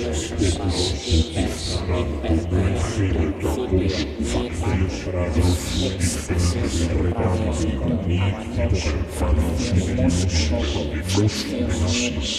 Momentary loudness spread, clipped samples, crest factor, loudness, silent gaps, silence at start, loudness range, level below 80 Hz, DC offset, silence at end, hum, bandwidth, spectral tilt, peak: 4 LU; under 0.1%; 16 dB; -22 LUFS; none; 0 s; 1 LU; -28 dBFS; under 0.1%; 0 s; none; 13.5 kHz; -5.5 dB/octave; -6 dBFS